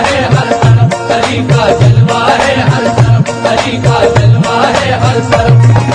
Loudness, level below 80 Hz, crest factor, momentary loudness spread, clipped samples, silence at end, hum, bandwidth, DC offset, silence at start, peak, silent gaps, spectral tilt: -8 LUFS; -30 dBFS; 8 dB; 4 LU; 1%; 0 s; none; 10 kHz; under 0.1%; 0 s; 0 dBFS; none; -6 dB/octave